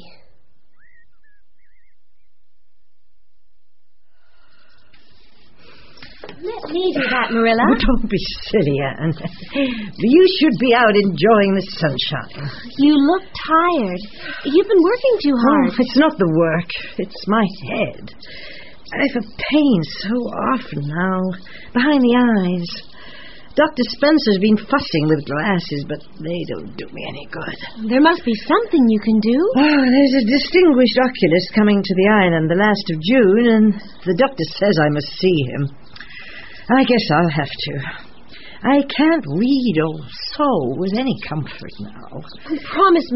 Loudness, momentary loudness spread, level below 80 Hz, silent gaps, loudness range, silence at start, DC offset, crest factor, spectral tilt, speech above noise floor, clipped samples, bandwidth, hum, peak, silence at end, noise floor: -16 LUFS; 16 LU; -40 dBFS; none; 6 LU; 6 s; 2%; 16 dB; -4.5 dB/octave; 56 dB; under 0.1%; 6 kHz; none; 0 dBFS; 0 s; -72 dBFS